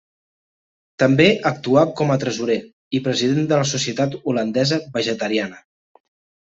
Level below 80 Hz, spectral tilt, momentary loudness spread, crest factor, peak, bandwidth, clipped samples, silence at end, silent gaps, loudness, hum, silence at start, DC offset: -60 dBFS; -5 dB/octave; 8 LU; 18 dB; -2 dBFS; 8 kHz; under 0.1%; 0.85 s; 2.73-2.91 s; -19 LUFS; none; 1 s; under 0.1%